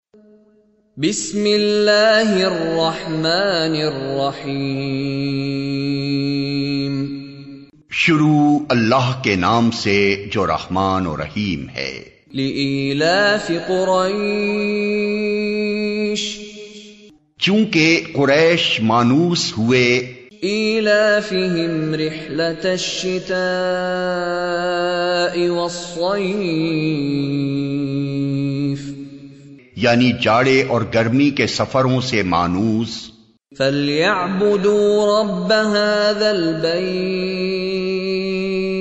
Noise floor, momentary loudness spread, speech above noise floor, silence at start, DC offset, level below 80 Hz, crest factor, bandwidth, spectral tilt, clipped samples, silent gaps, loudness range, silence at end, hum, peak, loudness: -55 dBFS; 9 LU; 38 dB; 0.95 s; under 0.1%; -50 dBFS; 16 dB; 8.2 kHz; -5 dB/octave; under 0.1%; none; 4 LU; 0 s; none; -2 dBFS; -18 LUFS